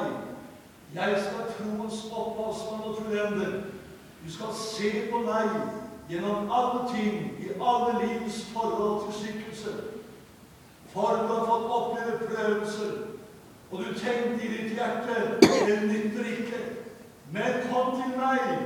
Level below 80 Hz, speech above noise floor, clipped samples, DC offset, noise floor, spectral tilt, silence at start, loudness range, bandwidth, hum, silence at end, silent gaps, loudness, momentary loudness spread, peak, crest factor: -64 dBFS; 24 dB; under 0.1%; under 0.1%; -52 dBFS; -5 dB/octave; 0 s; 6 LU; 19 kHz; none; 0 s; none; -29 LUFS; 15 LU; -2 dBFS; 28 dB